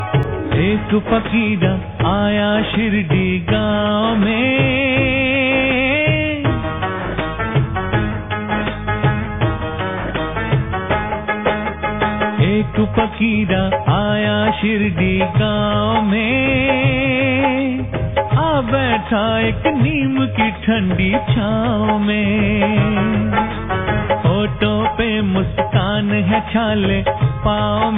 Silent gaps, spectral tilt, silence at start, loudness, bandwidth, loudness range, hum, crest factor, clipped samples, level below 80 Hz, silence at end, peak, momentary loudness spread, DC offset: none; -10.5 dB/octave; 0 s; -17 LUFS; 3.9 kHz; 4 LU; none; 14 dB; under 0.1%; -32 dBFS; 0 s; -2 dBFS; 5 LU; 0.5%